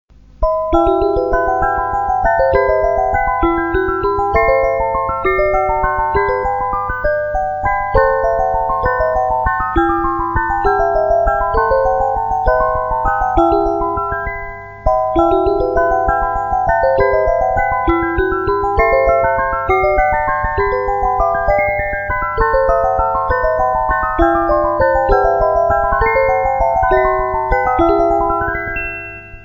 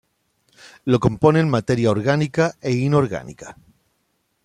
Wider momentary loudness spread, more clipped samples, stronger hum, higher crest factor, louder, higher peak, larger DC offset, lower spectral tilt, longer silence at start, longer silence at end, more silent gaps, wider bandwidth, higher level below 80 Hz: second, 5 LU vs 15 LU; neither; neither; second, 14 dB vs 20 dB; first, -15 LUFS vs -19 LUFS; about the same, 0 dBFS vs -2 dBFS; first, 0.4% vs under 0.1%; about the same, -8 dB/octave vs -7 dB/octave; second, 0.4 s vs 0.85 s; second, 0 s vs 0.9 s; neither; first, over 20 kHz vs 10.5 kHz; first, -26 dBFS vs -50 dBFS